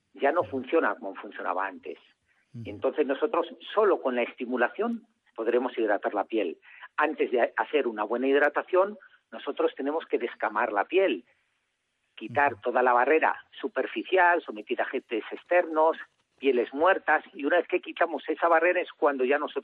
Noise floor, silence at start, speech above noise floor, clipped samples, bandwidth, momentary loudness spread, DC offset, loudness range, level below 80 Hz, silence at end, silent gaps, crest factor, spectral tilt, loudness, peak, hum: -77 dBFS; 0.15 s; 50 dB; under 0.1%; 4.7 kHz; 12 LU; under 0.1%; 4 LU; -82 dBFS; 0 s; none; 18 dB; -7 dB/octave; -27 LUFS; -10 dBFS; none